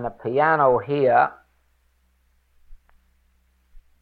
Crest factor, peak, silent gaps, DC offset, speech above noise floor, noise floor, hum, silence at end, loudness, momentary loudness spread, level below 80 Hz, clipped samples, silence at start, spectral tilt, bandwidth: 18 dB; -6 dBFS; none; under 0.1%; 44 dB; -64 dBFS; none; 1.25 s; -20 LUFS; 7 LU; -54 dBFS; under 0.1%; 0 s; -9 dB/octave; 4.8 kHz